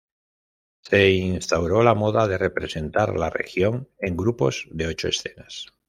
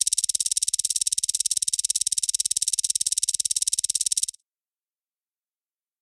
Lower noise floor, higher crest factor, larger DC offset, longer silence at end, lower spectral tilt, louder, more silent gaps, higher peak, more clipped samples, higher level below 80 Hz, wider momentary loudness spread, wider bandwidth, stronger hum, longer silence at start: about the same, under -90 dBFS vs under -90 dBFS; about the same, 20 dB vs 22 dB; neither; second, 0.25 s vs 1.75 s; first, -5.5 dB/octave vs 4 dB/octave; about the same, -22 LUFS vs -22 LUFS; neither; about the same, -2 dBFS vs -4 dBFS; neither; first, -48 dBFS vs -66 dBFS; first, 10 LU vs 1 LU; second, 13.5 kHz vs 15.5 kHz; neither; first, 0.85 s vs 0 s